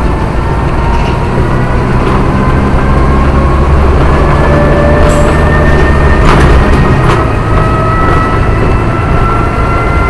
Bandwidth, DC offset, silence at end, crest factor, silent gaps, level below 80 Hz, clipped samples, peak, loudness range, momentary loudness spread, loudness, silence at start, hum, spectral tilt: 12 kHz; 3%; 0 s; 6 dB; none; -10 dBFS; 2%; 0 dBFS; 2 LU; 4 LU; -8 LUFS; 0 s; none; -7.5 dB/octave